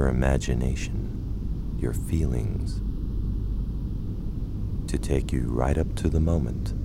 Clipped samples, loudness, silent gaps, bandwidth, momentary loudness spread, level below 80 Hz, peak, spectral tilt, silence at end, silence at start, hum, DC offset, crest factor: under 0.1%; -28 LUFS; none; 14 kHz; 8 LU; -28 dBFS; -6 dBFS; -7 dB/octave; 0 s; 0 s; none; 0.4%; 20 dB